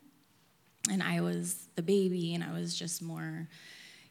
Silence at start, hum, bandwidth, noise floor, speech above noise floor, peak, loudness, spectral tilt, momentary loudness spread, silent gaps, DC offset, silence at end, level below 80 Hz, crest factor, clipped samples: 0.85 s; none; 17 kHz; -67 dBFS; 34 dB; -8 dBFS; -34 LUFS; -4.5 dB/octave; 17 LU; none; under 0.1%; 0.1 s; under -90 dBFS; 26 dB; under 0.1%